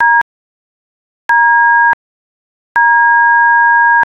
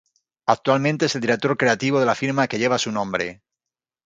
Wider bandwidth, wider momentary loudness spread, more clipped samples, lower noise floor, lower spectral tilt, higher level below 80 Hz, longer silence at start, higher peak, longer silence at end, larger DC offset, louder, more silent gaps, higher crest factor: second, 5.6 kHz vs 9.4 kHz; first, 10 LU vs 6 LU; neither; about the same, under -90 dBFS vs -88 dBFS; second, -2 dB/octave vs -5 dB/octave; about the same, -62 dBFS vs -62 dBFS; second, 0 s vs 0.45 s; about the same, -2 dBFS vs -2 dBFS; second, 0.15 s vs 0.7 s; neither; first, -9 LUFS vs -21 LUFS; first, 0.22-1.29 s, 1.93-2.75 s vs none; second, 10 dB vs 20 dB